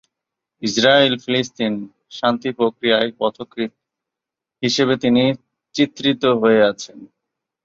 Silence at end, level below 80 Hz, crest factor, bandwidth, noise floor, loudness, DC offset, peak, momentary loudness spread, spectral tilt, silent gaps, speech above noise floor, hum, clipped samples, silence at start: 0.6 s; -60 dBFS; 18 dB; 7.6 kHz; -86 dBFS; -18 LUFS; under 0.1%; 0 dBFS; 14 LU; -4.5 dB/octave; none; 68 dB; none; under 0.1%; 0.6 s